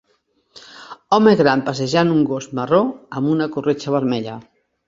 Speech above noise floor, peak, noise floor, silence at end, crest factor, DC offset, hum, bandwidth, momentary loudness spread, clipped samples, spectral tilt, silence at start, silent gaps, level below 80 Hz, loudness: 47 dB; -2 dBFS; -64 dBFS; 0.45 s; 18 dB; under 0.1%; none; 7.8 kHz; 19 LU; under 0.1%; -6.5 dB/octave; 0.55 s; none; -58 dBFS; -18 LUFS